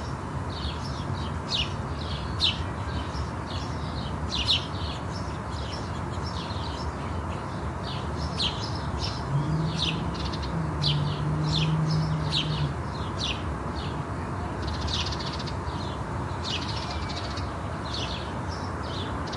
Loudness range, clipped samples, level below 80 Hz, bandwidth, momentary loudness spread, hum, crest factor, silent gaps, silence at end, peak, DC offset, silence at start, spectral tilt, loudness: 4 LU; under 0.1%; -40 dBFS; 11.5 kHz; 8 LU; none; 18 dB; none; 0 s; -10 dBFS; under 0.1%; 0 s; -5 dB/octave; -30 LUFS